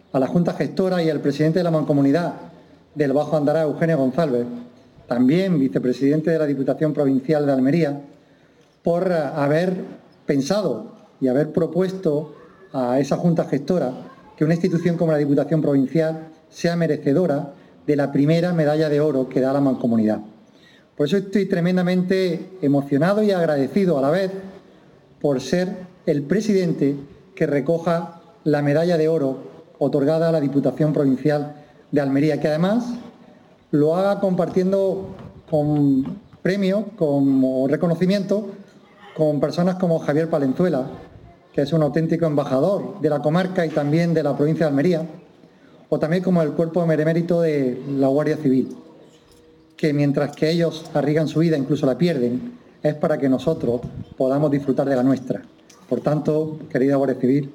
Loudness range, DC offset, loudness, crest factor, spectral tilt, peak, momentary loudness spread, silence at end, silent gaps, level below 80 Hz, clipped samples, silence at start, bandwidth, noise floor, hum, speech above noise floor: 2 LU; under 0.1%; -20 LUFS; 14 dB; -8 dB/octave; -6 dBFS; 8 LU; 0.05 s; none; -60 dBFS; under 0.1%; 0.15 s; 13 kHz; -55 dBFS; none; 35 dB